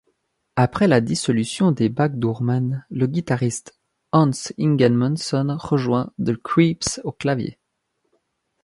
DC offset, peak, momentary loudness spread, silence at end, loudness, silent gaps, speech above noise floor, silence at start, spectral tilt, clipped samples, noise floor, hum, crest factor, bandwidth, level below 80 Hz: under 0.1%; -2 dBFS; 8 LU; 1.1 s; -21 LUFS; none; 54 dB; 0.55 s; -6 dB/octave; under 0.1%; -73 dBFS; none; 18 dB; 11.5 kHz; -54 dBFS